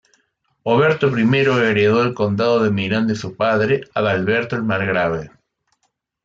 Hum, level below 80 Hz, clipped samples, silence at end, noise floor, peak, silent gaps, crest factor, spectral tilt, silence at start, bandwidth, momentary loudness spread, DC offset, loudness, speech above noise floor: none; -56 dBFS; under 0.1%; 0.95 s; -70 dBFS; -4 dBFS; none; 14 dB; -7 dB/octave; 0.65 s; 7.6 kHz; 6 LU; under 0.1%; -18 LUFS; 53 dB